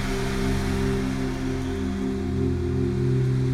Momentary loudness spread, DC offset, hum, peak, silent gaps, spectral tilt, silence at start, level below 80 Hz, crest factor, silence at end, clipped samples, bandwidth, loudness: 4 LU; under 0.1%; none; -12 dBFS; none; -7 dB/octave; 0 s; -34 dBFS; 12 dB; 0 s; under 0.1%; 13.5 kHz; -26 LUFS